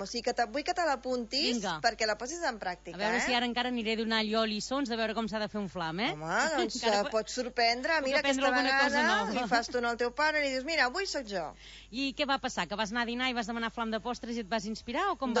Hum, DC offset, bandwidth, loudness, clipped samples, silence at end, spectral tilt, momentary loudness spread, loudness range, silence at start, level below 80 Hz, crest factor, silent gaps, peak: none; under 0.1%; 8 kHz; -31 LUFS; under 0.1%; 0 s; -3 dB/octave; 8 LU; 5 LU; 0 s; -58 dBFS; 18 dB; none; -12 dBFS